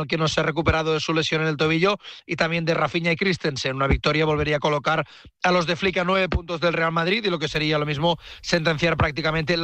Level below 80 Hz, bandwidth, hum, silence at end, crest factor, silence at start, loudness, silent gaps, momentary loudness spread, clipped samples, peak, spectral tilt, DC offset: -38 dBFS; 8.6 kHz; none; 0 s; 16 dB; 0 s; -22 LUFS; none; 4 LU; under 0.1%; -6 dBFS; -5 dB/octave; under 0.1%